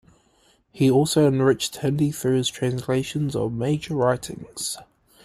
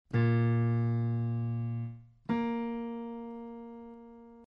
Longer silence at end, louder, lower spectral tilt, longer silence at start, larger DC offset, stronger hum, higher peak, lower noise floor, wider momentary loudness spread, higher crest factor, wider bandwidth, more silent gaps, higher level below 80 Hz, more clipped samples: first, 0.4 s vs 0.05 s; first, -23 LUFS vs -32 LUFS; second, -5.5 dB/octave vs -10.5 dB/octave; first, 0.75 s vs 0.1 s; neither; neither; first, -6 dBFS vs -18 dBFS; first, -61 dBFS vs -52 dBFS; second, 11 LU vs 19 LU; about the same, 16 dB vs 14 dB; first, 15.5 kHz vs 5 kHz; neither; first, -54 dBFS vs -66 dBFS; neither